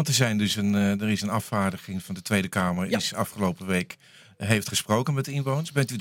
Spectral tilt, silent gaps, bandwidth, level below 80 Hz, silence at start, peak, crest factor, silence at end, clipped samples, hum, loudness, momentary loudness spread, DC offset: -4.5 dB/octave; none; 17 kHz; -64 dBFS; 0 s; -4 dBFS; 22 dB; 0 s; under 0.1%; none; -26 LUFS; 8 LU; under 0.1%